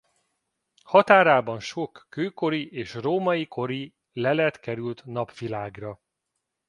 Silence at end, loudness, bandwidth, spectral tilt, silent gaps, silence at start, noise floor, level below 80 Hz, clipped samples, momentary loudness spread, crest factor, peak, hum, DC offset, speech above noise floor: 0.75 s; -24 LUFS; 11 kHz; -6 dB/octave; none; 0.9 s; -81 dBFS; -66 dBFS; under 0.1%; 17 LU; 24 dB; -2 dBFS; none; under 0.1%; 57 dB